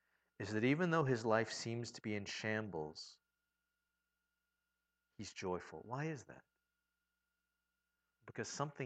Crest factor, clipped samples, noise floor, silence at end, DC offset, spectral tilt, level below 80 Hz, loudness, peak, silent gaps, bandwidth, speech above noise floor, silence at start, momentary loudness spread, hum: 24 dB; under 0.1%; -89 dBFS; 0 s; under 0.1%; -5.5 dB/octave; -80 dBFS; -40 LUFS; -20 dBFS; none; 9 kHz; 49 dB; 0.4 s; 16 LU; none